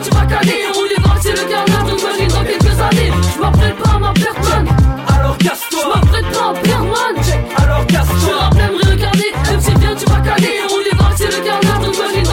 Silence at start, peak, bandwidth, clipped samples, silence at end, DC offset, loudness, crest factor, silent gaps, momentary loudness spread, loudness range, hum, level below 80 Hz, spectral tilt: 0 s; -2 dBFS; 17 kHz; under 0.1%; 0 s; under 0.1%; -13 LUFS; 10 dB; none; 3 LU; 1 LU; none; -18 dBFS; -5 dB/octave